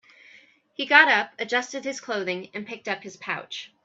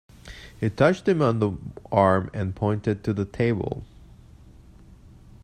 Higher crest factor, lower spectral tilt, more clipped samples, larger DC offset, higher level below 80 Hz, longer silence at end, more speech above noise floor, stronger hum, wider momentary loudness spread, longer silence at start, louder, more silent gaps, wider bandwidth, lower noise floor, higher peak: about the same, 24 dB vs 22 dB; second, -2.5 dB/octave vs -8 dB/octave; neither; neither; second, -80 dBFS vs -50 dBFS; second, 0.2 s vs 1.6 s; first, 30 dB vs 26 dB; neither; about the same, 18 LU vs 17 LU; first, 0.8 s vs 0.25 s; about the same, -23 LUFS vs -24 LUFS; neither; second, 8 kHz vs 10 kHz; first, -55 dBFS vs -49 dBFS; about the same, -2 dBFS vs -4 dBFS